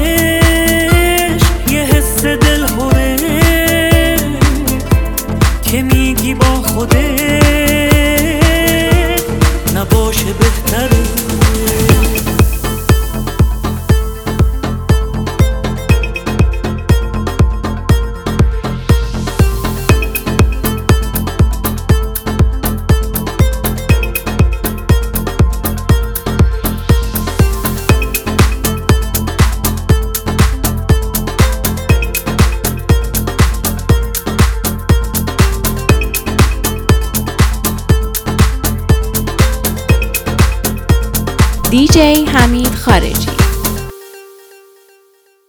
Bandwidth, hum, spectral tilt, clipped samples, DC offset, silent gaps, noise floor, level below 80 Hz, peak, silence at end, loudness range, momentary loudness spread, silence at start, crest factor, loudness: over 20 kHz; none; -5 dB/octave; under 0.1%; 0.1%; none; -51 dBFS; -16 dBFS; 0 dBFS; 1.2 s; 4 LU; 7 LU; 0 s; 12 dB; -13 LUFS